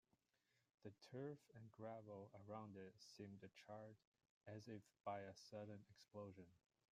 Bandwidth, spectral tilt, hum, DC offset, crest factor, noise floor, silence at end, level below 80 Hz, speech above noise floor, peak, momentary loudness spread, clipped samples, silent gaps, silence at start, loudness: 15 kHz; -6 dB/octave; none; under 0.1%; 20 dB; -88 dBFS; 0.35 s; under -90 dBFS; 30 dB; -38 dBFS; 9 LU; under 0.1%; 4.07-4.12 s, 4.30-4.41 s; 0.8 s; -59 LUFS